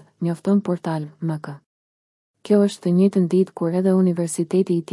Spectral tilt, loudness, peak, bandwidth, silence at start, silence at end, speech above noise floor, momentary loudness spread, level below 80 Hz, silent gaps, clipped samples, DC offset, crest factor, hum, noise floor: -7.5 dB/octave; -20 LUFS; -6 dBFS; 12 kHz; 0.2 s; 0 s; over 70 dB; 10 LU; -72 dBFS; 1.66-2.34 s; under 0.1%; under 0.1%; 16 dB; none; under -90 dBFS